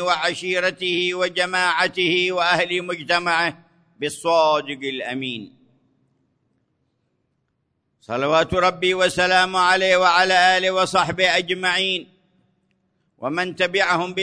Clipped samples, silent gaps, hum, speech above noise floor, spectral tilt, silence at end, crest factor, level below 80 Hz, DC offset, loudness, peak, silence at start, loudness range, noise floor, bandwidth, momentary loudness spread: under 0.1%; none; none; 52 dB; -3 dB/octave; 0 s; 18 dB; -56 dBFS; under 0.1%; -19 LUFS; -4 dBFS; 0 s; 10 LU; -72 dBFS; 11 kHz; 11 LU